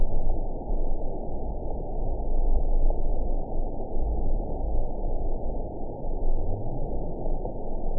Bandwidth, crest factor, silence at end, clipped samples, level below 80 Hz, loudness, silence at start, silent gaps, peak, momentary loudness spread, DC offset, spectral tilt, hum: 1 kHz; 14 dB; 0 s; under 0.1%; -26 dBFS; -33 LUFS; 0 s; none; -10 dBFS; 5 LU; 0.9%; -16.5 dB/octave; none